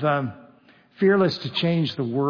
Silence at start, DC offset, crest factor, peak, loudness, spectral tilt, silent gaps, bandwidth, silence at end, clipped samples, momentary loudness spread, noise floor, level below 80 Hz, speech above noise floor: 0 s; under 0.1%; 16 dB; -8 dBFS; -22 LUFS; -7.5 dB/octave; none; 5.4 kHz; 0 s; under 0.1%; 7 LU; -54 dBFS; -68 dBFS; 33 dB